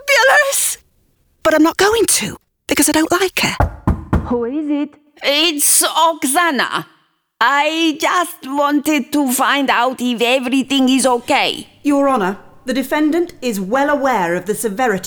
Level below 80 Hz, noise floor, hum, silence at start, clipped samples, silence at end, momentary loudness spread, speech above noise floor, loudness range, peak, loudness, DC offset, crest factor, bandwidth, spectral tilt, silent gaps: -36 dBFS; -58 dBFS; none; 0 s; under 0.1%; 0 s; 10 LU; 43 dB; 2 LU; -2 dBFS; -15 LUFS; under 0.1%; 14 dB; over 20 kHz; -3 dB/octave; none